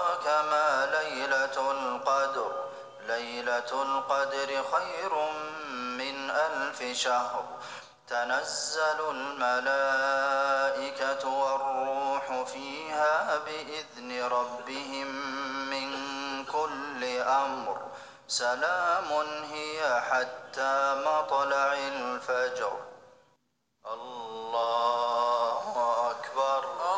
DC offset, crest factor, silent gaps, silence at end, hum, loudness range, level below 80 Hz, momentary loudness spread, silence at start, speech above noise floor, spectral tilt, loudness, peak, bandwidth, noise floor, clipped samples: under 0.1%; 16 dB; none; 0 s; none; 4 LU; -80 dBFS; 10 LU; 0 s; 45 dB; -1.5 dB/octave; -29 LUFS; -14 dBFS; 10 kHz; -75 dBFS; under 0.1%